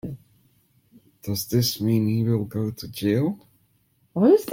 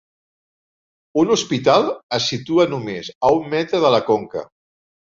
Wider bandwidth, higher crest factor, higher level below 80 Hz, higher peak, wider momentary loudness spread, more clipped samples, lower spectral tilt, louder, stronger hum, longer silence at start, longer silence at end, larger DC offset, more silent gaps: first, 16.5 kHz vs 7.6 kHz; about the same, 18 dB vs 18 dB; about the same, -58 dBFS vs -58 dBFS; second, -6 dBFS vs -2 dBFS; first, 18 LU vs 10 LU; neither; first, -6.5 dB/octave vs -4.5 dB/octave; second, -24 LUFS vs -18 LUFS; neither; second, 0.05 s vs 1.15 s; second, 0 s vs 0.65 s; neither; second, none vs 2.03-2.09 s, 3.15-3.21 s